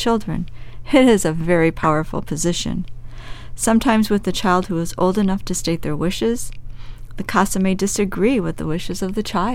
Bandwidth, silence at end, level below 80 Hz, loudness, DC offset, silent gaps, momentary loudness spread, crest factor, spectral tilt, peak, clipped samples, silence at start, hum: 16.5 kHz; 0 s; -34 dBFS; -19 LUFS; under 0.1%; none; 15 LU; 18 dB; -5 dB/octave; -2 dBFS; under 0.1%; 0 s; none